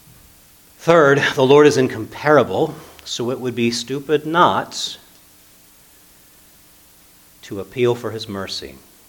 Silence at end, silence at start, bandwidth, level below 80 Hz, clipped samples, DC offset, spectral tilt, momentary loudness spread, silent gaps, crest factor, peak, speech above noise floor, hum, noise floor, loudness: 0.4 s; 0.8 s; 19 kHz; -58 dBFS; under 0.1%; under 0.1%; -5 dB/octave; 17 LU; none; 20 dB; 0 dBFS; 32 dB; none; -49 dBFS; -17 LUFS